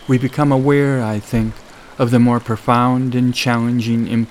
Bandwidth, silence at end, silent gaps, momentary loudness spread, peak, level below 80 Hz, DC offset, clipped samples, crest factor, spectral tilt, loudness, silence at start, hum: 14.5 kHz; 0 s; none; 7 LU; 0 dBFS; -42 dBFS; under 0.1%; under 0.1%; 16 dB; -7 dB/octave; -16 LUFS; 0 s; none